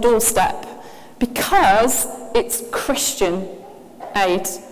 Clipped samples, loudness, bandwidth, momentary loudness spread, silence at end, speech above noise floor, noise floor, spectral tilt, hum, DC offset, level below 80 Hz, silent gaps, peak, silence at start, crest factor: under 0.1%; -18 LUFS; 16 kHz; 19 LU; 0 s; 21 dB; -39 dBFS; -2.5 dB/octave; none; under 0.1%; -42 dBFS; none; -2 dBFS; 0 s; 18 dB